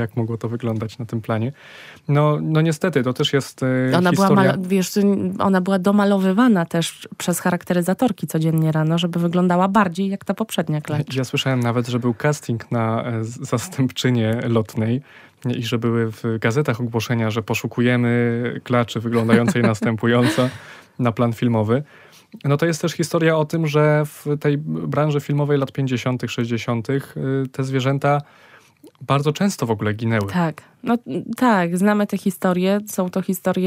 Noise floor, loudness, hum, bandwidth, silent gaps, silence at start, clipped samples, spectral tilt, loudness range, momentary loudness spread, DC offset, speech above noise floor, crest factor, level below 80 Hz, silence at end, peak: -48 dBFS; -20 LUFS; none; 16 kHz; none; 0 s; under 0.1%; -6.5 dB/octave; 4 LU; 8 LU; under 0.1%; 29 dB; 18 dB; -62 dBFS; 0 s; -2 dBFS